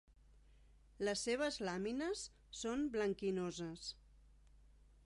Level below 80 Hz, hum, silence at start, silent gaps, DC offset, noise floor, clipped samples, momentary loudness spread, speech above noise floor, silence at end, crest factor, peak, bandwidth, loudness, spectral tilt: -66 dBFS; 50 Hz at -65 dBFS; 0.5 s; none; under 0.1%; -66 dBFS; under 0.1%; 10 LU; 25 dB; 0.45 s; 16 dB; -26 dBFS; 11.5 kHz; -41 LUFS; -4 dB/octave